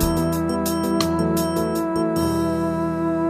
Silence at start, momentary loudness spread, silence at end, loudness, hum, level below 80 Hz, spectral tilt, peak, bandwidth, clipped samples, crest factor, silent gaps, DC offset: 0 s; 2 LU; 0 s; -22 LUFS; none; -38 dBFS; -6 dB/octave; -4 dBFS; 15.5 kHz; under 0.1%; 18 dB; none; under 0.1%